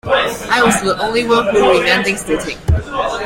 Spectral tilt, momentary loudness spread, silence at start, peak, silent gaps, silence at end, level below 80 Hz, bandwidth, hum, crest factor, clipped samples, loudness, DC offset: -4 dB/octave; 7 LU; 0.05 s; 0 dBFS; none; 0 s; -30 dBFS; 16.5 kHz; none; 14 dB; under 0.1%; -14 LUFS; under 0.1%